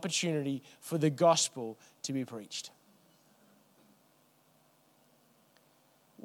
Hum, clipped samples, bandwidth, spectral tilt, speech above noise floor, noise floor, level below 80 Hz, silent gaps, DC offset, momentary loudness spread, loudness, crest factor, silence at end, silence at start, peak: none; under 0.1%; 19 kHz; -4 dB/octave; 35 dB; -67 dBFS; -88 dBFS; none; under 0.1%; 16 LU; -32 LUFS; 22 dB; 3.55 s; 0 s; -14 dBFS